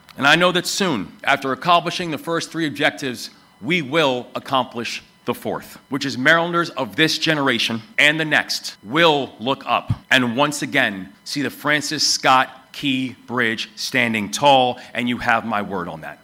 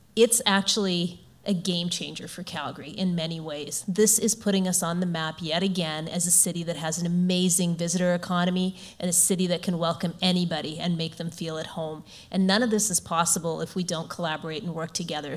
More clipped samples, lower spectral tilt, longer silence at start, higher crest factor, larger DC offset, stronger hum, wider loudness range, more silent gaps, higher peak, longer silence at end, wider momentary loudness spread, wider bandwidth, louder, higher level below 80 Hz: neither; about the same, -3.5 dB/octave vs -3.5 dB/octave; about the same, 0.15 s vs 0.15 s; about the same, 18 dB vs 20 dB; neither; neither; about the same, 4 LU vs 3 LU; neither; first, -2 dBFS vs -6 dBFS; about the same, 0.1 s vs 0 s; about the same, 12 LU vs 12 LU; about the same, 16.5 kHz vs 16 kHz; first, -19 LUFS vs -25 LUFS; first, -56 dBFS vs -62 dBFS